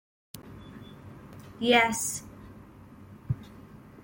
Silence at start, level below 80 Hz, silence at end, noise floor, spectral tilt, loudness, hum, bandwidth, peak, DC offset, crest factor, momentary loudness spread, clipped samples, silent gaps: 0.35 s; -58 dBFS; 0.05 s; -50 dBFS; -3.5 dB/octave; -27 LUFS; none; 17 kHz; -8 dBFS; under 0.1%; 24 dB; 28 LU; under 0.1%; none